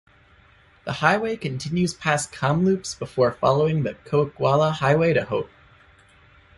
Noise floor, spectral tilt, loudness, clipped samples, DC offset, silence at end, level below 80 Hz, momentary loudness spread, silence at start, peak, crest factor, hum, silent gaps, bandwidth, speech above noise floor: -55 dBFS; -5.5 dB/octave; -22 LUFS; under 0.1%; under 0.1%; 1.1 s; -54 dBFS; 9 LU; 0.85 s; -2 dBFS; 22 dB; none; none; 11.5 kHz; 33 dB